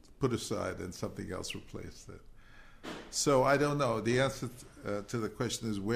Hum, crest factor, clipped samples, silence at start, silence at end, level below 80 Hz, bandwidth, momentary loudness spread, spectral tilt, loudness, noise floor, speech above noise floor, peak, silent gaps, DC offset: none; 20 dB; under 0.1%; 0.1 s; 0 s; -56 dBFS; 15.5 kHz; 19 LU; -4.5 dB/octave; -33 LUFS; -54 dBFS; 21 dB; -14 dBFS; none; under 0.1%